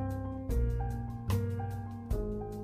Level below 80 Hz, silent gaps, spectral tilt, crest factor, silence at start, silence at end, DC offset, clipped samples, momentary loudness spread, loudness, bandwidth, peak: -38 dBFS; none; -8 dB/octave; 16 dB; 0 s; 0 s; under 0.1%; under 0.1%; 5 LU; -36 LUFS; 15.5 kHz; -18 dBFS